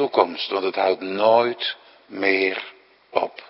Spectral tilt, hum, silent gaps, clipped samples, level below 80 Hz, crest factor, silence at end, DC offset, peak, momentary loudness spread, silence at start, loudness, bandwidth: -8.5 dB/octave; none; none; under 0.1%; -74 dBFS; 22 dB; 0.05 s; under 0.1%; 0 dBFS; 14 LU; 0 s; -22 LUFS; 5.8 kHz